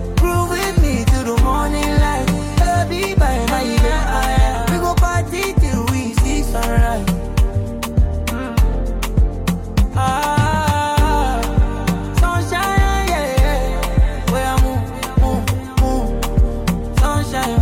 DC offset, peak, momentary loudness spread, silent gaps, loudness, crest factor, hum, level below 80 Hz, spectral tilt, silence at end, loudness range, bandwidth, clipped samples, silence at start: under 0.1%; -4 dBFS; 4 LU; none; -18 LUFS; 12 dB; none; -18 dBFS; -5.5 dB/octave; 0 s; 2 LU; 16.5 kHz; under 0.1%; 0 s